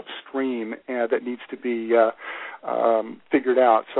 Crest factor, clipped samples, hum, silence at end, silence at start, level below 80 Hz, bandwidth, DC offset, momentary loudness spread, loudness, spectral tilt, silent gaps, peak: 18 dB; under 0.1%; none; 0 s; 0.05 s; -68 dBFS; 4.1 kHz; under 0.1%; 14 LU; -23 LUFS; -9 dB/octave; none; -6 dBFS